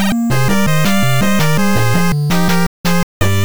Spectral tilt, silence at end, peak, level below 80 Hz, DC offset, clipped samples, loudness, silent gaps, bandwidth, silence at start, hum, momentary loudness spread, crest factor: -5 dB/octave; 0 s; -2 dBFS; -34 dBFS; 20%; under 0.1%; -14 LUFS; 2.67-2.84 s, 3.03-3.20 s; over 20 kHz; 0 s; none; 3 LU; 12 dB